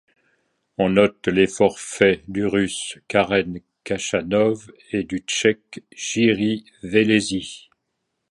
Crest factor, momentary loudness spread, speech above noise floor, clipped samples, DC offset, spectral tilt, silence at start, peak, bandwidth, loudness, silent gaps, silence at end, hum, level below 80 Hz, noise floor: 20 dB; 13 LU; 56 dB; under 0.1%; under 0.1%; -4.5 dB/octave; 0.8 s; 0 dBFS; 11.5 kHz; -21 LUFS; none; 0.7 s; none; -52 dBFS; -76 dBFS